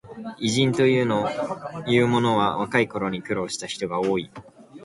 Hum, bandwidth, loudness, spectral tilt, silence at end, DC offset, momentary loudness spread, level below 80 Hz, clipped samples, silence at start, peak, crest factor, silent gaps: none; 11.5 kHz; -23 LUFS; -5 dB/octave; 0 s; under 0.1%; 10 LU; -58 dBFS; under 0.1%; 0.05 s; -4 dBFS; 18 dB; none